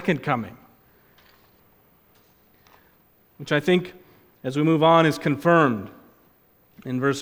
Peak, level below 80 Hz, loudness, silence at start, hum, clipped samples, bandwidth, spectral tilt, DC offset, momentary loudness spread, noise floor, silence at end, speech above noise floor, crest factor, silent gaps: -4 dBFS; -64 dBFS; -21 LUFS; 0 s; none; under 0.1%; 16.5 kHz; -6.5 dB/octave; under 0.1%; 23 LU; -59 dBFS; 0 s; 39 dB; 20 dB; none